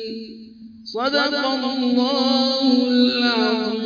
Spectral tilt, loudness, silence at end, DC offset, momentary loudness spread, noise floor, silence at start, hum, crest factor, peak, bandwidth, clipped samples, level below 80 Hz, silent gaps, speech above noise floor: -4 dB/octave; -19 LUFS; 0 s; under 0.1%; 15 LU; -41 dBFS; 0 s; none; 14 dB; -6 dBFS; 5.2 kHz; under 0.1%; -64 dBFS; none; 21 dB